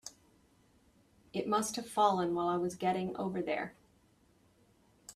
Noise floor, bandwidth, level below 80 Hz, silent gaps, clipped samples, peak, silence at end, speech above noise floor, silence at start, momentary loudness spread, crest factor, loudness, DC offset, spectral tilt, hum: -68 dBFS; 14.5 kHz; -72 dBFS; none; under 0.1%; -14 dBFS; 0.05 s; 35 dB; 0.05 s; 13 LU; 22 dB; -34 LUFS; under 0.1%; -4.5 dB/octave; none